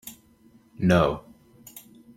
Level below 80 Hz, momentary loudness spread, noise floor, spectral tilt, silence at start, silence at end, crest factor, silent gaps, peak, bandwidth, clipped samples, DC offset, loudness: -50 dBFS; 25 LU; -57 dBFS; -6.5 dB/octave; 0.05 s; 0.35 s; 20 dB; none; -6 dBFS; 16.5 kHz; under 0.1%; under 0.1%; -23 LUFS